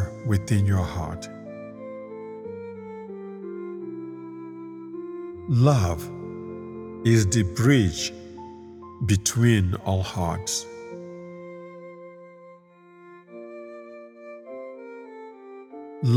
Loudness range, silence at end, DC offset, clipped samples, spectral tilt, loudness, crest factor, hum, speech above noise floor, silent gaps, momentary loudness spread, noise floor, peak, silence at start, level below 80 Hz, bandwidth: 19 LU; 0 s; under 0.1%; under 0.1%; -5.5 dB/octave; -25 LUFS; 22 dB; none; 30 dB; none; 23 LU; -51 dBFS; -6 dBFS; 0 s; -48 dBFS; 16 kHz